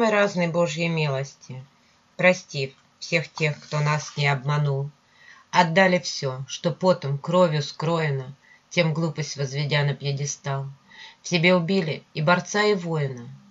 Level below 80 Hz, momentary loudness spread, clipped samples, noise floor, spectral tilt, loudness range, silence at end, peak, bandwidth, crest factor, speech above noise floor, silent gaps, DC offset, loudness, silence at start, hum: -68 dBFS; 13 LU; under 0.1%; -52 dBFS; -5 dB/octave; 3 LU; 0.15 s; -2 dBFS; 7.8 kHz; 22 dB; 29 dB; none; under 0.1%; -23 LUFS; 0 s; none